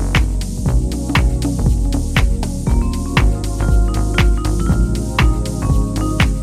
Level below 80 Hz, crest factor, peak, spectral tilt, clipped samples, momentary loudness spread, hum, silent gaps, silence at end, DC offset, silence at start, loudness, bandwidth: -18 dBFS; 14 dB; 0 dBFS; -5.5 dB/octave; under 0.1%; 3 LU; none; none; 0 s; under 0.1%; 0 s; -17 LUFS; 14 kHz